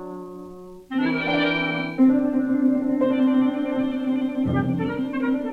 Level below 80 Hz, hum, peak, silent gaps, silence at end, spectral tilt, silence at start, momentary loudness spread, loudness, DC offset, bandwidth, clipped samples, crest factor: -54 dBFS; none; -8 dBFS; none; 0 s; -8 dB/octave; 0 s; 16 LU; -22 LUFS; under 0.1%; 5 kHz; under 0.1%; 14 dB